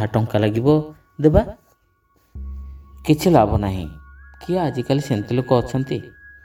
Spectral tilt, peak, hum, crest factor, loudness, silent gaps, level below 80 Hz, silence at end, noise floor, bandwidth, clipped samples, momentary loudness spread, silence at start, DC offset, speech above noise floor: -7.5 dB/octave; 0 dBFS; none; 20 dB; -19 LUFS; none; -36 dBFS; 0.15 s; -62 dBFS; 19 kHz; under 0.1%; 20 LU; 0 s; under 0.1%; 43 dB